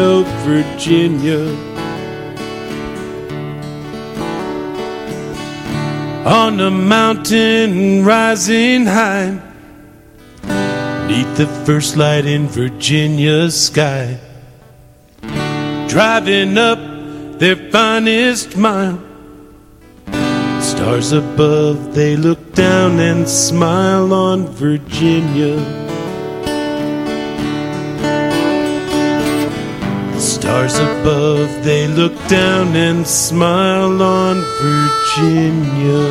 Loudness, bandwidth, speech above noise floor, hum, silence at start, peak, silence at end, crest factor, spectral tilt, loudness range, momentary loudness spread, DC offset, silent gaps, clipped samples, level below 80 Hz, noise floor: -14 LUFS; 16 kHz; 30 dB; none; 0 s; 0 dBFS; 0 s; 14 dB; -5 dB/octave; 6 LU; 13 LU; under 0.1%; none; under 0.1%; -44 dBFS; -43 dBFS